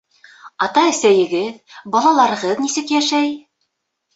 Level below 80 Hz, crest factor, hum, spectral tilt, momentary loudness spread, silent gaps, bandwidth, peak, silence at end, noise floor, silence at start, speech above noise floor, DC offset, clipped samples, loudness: -66 dBFS; 16 dB; none; -3 dB/octave; 9 LU; none; 8.4 kHz; -2 dBFS; 0.75 s; -72 dBFS; 0.45 s; 56 dB; under 0.1%; under 0.1%; -16 LUFS